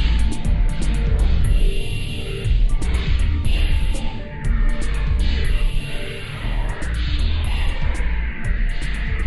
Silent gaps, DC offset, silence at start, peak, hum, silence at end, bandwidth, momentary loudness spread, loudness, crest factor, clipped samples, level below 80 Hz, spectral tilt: none; under 0.1%; 0 s; -6 dBFS; none; 0 s; 12 kHz; 6 LU; -24 LUFS; 12 dB; under 0.1%; -20 dBFS; -5.5 dB/octave